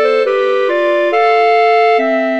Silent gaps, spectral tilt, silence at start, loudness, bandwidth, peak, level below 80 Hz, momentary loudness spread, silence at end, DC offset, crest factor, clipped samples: none; -3 dB/octave; 0 s; -12 LUFS; 8 kHz; 0 dBFS; -66 dBFS; 3 LU; 0 s; 0.5%; 10 dB; under 0.1%